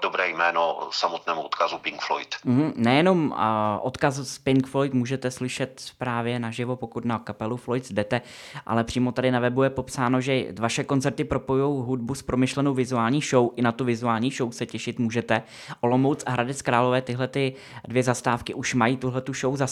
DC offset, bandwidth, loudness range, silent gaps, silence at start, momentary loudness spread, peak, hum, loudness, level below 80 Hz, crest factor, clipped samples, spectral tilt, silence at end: under 0.1%; 13 kHz; 4 LU; none; 0 s; 7 LU; -4 dBFS; none; -25 LUFS; -56 dBFS; 20 dB; under 0.1%; -5.5 dB/octave; 0 s